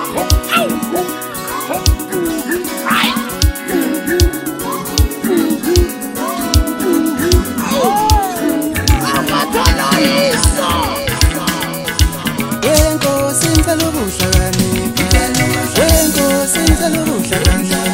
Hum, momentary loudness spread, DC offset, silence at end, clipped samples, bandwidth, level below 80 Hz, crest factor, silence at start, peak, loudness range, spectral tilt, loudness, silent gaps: none; 6 LU; under 0.1%; 0 s; under 0.1%; 16.5 kHz; -20 dBFS; 14 dB; 0 s; 0 dBFS; 3 LU; -4 dB/octave; -14 LUFS; none